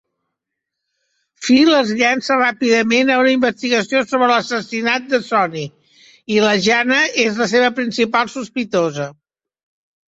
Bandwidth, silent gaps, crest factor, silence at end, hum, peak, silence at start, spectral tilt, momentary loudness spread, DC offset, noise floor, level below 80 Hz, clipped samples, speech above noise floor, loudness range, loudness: 8 kHz; none; 16 dB; 1 s; none; 0 dBFS; 1.4 s; -4 dB/octave; 9 LU; under 0.1%; -80 dBFS; -60 dBFS; under 0.1%; 64 dB; 3 LU; -15 LUFS